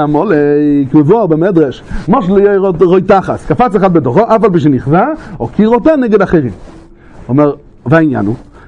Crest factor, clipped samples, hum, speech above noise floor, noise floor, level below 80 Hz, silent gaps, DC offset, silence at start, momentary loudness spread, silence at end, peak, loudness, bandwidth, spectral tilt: 10 dB; 0.3%; none; 25 dB; -34 dBFS; -34 dBFS; none; under 0.1%; 0 s; 7 LU; 0.25 s; 0 dBFS; -10 LUFS; 9.2 kHz; -9 dB/octave